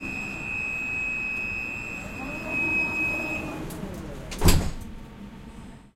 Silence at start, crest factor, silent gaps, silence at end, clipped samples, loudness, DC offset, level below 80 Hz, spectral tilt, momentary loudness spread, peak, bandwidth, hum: 0 s; 24 dB; none; 0.05 s; under 0.1%; -27 LUFS; under 0.1%; -34 dBFS; -4.5 dB/octave; 20 LU; -4 dBFS; 16.5 kHz; none